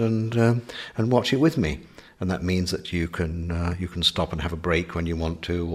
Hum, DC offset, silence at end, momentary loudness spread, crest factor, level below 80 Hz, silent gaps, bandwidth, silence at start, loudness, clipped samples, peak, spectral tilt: none; under 0.1%; 0 s; 7 LU; 20 dB; -40 dBFS; none; 14.5 kHz; 0 s; -25 LUFS; under 0.1%; -6 dBFS; -6 dB/octave